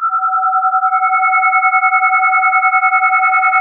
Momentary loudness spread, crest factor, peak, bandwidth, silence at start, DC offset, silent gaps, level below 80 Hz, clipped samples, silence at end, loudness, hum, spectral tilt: 2 LU; 12 dB; -2 dBFS; 3.4 kHz; 0 s; under 0.1%; none; -76 dBFS; under 0.1%; 0 s; -11 LUFS; none; -2 dB/octave